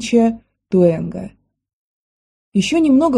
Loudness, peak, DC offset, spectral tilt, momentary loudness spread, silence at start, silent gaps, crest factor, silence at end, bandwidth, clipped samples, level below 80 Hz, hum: -17 LUFS; -2 dBFS; under 0.1%; -6.5 dB/octave; 18 LU; 0 s; 1.73-2.52 s; 16 dB; 0 s; 11 kHz; under 0.1%; -50 dBFS; none